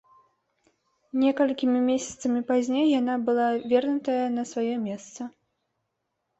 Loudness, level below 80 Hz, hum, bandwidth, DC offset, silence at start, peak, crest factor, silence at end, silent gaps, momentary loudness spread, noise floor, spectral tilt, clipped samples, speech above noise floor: -25 LUFS; -70 dBFS; none; 8.2 kHz; under 0.1%; 1.15 s; -10 dBFS; 16 dB; 1.1 s; none; 11 LU; -79 dBFS; -4.5 dB/octave; under 0.1%; 55 dB